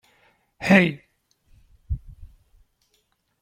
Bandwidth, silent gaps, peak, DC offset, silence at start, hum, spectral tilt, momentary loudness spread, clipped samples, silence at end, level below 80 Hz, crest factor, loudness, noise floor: 12.5 kHz; none; -2 dBFS; under 0.1%; 0.6 s; none; -6.5 dB/octave; 17 LU; under 0.1%; 1.15 s; -42 dBFS; 24 dB; -21 LUFS; -69 dBFS